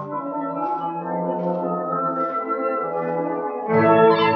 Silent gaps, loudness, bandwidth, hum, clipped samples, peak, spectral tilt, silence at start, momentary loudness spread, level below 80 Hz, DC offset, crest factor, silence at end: none; -22 LUFS; 5.8 kHz; none; under 0.1%; -4 dBFS; -5 dB/octave; 0 s; 11 LU; -76 dBFS; under 0.1%; 18 dB; 0 s